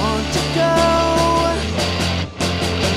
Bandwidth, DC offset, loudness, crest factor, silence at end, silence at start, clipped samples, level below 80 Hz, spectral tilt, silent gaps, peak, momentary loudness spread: 15.5 kHz; under 0.1%; -17 LUFS; 14 dB; 0 s; 0 s; under 0.1%; -30 dBFS; -4.5 dB/octave; none; -2 dBFS; 5 LU